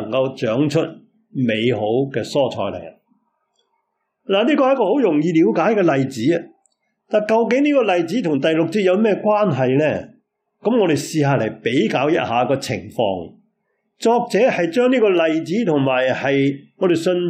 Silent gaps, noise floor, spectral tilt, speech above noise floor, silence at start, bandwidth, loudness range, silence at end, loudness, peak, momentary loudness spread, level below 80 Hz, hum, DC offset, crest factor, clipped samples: none; -72 dBFS; -6.5 dB/octave; 55 dB; 0 s; 15 kHz; 4 LU; 0 s; -18 LUFS; -6 dBFS; 6 LU; -66 dBFS; none; under 0.1%; 12 dB; under 0.1%